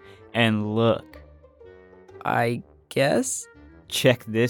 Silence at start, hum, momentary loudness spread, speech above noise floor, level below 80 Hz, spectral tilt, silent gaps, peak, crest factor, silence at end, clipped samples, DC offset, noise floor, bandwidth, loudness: 0.1 s; none; 10 LU; 26 dB; -58 dBFS; -4.5 dB/octave; none; -6 dBFS; 20 dB; 0 s; under 0.1%; under 0.1%; -49 dBFS; 19 kHz; -24 LUFS